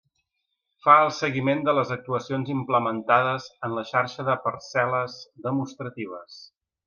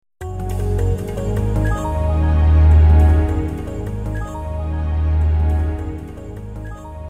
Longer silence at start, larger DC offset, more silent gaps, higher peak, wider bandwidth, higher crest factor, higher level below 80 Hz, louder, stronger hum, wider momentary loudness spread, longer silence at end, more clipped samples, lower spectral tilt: first, 0.85 s vs 0.05 s; second, under 0.1% vs 0.7%; neither; about the same, -2 dBFS vs -4 dBFS; second, 7.2 kHz vs 8.6 kHz; first, 22 dB vs 14 dB; second, -72 dBFS vs -18 dBFS; second, -24 LUFS vs -18 LUFS; neither; second, 16 LU vs 19 LU; first, 0.4 s vs 0 s; neither; second, -6 dB/octave vs -8.5 dB/octave